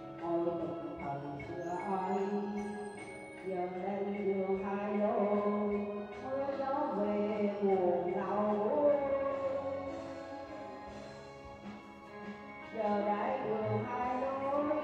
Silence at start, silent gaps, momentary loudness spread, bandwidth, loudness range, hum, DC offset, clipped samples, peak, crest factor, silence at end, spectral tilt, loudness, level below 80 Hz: 0 s; none; 15 LU; 9.8 kHz; 7 LU; none; under 0.1%; under 0.1%; -18 dBFS; 16 dB; 0 s; -8 dB/octave; -35 LUFS; -68 dBFS